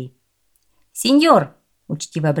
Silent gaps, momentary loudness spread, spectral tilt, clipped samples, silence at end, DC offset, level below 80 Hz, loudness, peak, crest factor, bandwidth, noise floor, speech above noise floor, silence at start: none; 21 LU; -5 dB/octave; under 0.1%; 0 s; under 0.1%; -66 dBFS; -17 LUFS; 0 dBFS; 18 dB; 16.5 kHz; -66 dBFS; 50 dB; 0 s